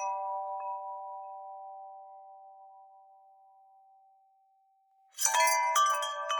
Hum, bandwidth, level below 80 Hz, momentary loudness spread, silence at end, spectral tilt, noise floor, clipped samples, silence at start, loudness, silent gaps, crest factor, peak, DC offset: none; over 20 kHz; under -90 dBFS; 26 LU; 0 s; 7 dB/octave; -69 dBFS; under 0.1%; 0 s; -29 LUFS; none; 24 dB; -10 dBFS; under 0.1%